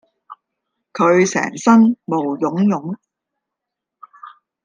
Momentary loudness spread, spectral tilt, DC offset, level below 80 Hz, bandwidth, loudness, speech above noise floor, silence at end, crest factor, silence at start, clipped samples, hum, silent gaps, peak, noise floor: 16 LU; -6 dB/octave; under 0.1%; -68 dBFS; 9.4 kHz; -16 LUFS; 67 dB; 0.35 s; 16 dB; 0.3 s; under 0.1%; none; none; -2 dBFS; -82 dBFS